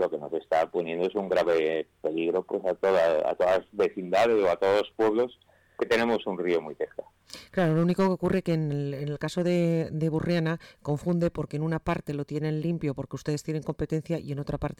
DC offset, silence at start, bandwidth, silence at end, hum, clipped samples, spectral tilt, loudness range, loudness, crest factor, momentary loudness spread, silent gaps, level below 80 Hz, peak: under 0.1%; 0 s; 14.5 kHz; 0.05 s; none; under 0.1%; -7 dB/octave; 5 LU; -27 LUFS; 10 dB; 9 LU; none; -54 dBFS; -16 dBFS